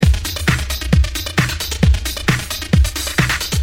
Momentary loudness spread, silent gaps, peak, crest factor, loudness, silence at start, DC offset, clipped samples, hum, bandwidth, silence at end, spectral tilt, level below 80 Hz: 2 LU; none; 0 dBFS; 16 dB; -17 LUFS; 0 s; under 0.1%; under 0.1%; none; 17 kHz; 0 s; -4.5 dB/octave; -20 dBFS